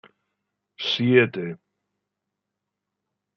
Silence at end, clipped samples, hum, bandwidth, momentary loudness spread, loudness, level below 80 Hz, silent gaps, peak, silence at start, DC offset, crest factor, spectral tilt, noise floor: 1.8 s; under 0.1%; 50 Hz at -65 dBFS; 6.6 kHz; 16 LU; -22 LUFS; -76 dBFS; none; -4 dBFS; 0.8 s; under 0.1%; 24 dB; -6.5 dB/octave; -83 dBFS